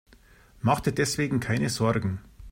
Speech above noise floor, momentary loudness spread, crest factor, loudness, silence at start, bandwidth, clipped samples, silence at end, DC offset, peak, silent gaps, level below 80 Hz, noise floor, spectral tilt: 30 dB; 6 LU; 18 dB; -26 LUFS; 0.65 s; 16 kHz; under 0.1%; 0 s; under 0.1%; -10 dBFS; none; -50 dBFS; -55 dBFS; -5.5 dB/octave